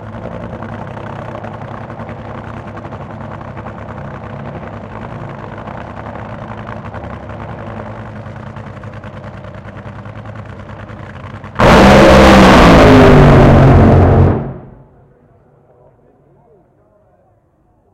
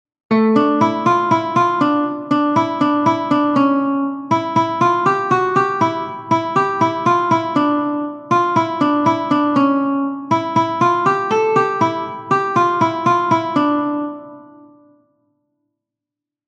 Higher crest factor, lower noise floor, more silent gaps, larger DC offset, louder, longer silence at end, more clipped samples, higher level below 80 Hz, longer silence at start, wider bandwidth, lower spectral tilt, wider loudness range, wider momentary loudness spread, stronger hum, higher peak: about the same, 12 dB vs 16 dB; second, -54 dBFS vs -86 dBFS; neither; neither; first, -6 LUFS vs -16 LUFS; first, 3.35 s vs 2.05 s; neither; first, -22 dBFS vs -62 dBFS; second, 0 s vs 0.3 s; first, 15.5 kHz vs 8.2 kHz; about the same, -7 dB/octave vs -6.5 dB/octave; first, 23 LU vs 3 LU; first, 25 LU vs 5 LU; neither; about the same, 0 dBFS vs 0 dBFS